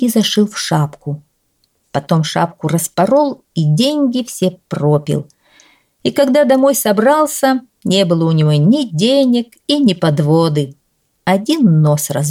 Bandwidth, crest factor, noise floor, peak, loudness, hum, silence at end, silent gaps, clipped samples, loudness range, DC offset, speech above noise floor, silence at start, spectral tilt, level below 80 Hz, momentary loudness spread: 16.5 kHz; 12 dB; -62 dBFS; -2 dBFS; -14 LUFS; none; 0 s; none; under 0.1%; 4 LU; under 0.1%; 49 dB; 0 s; -5.5 dB/octave; -58 dBFS; 9 LU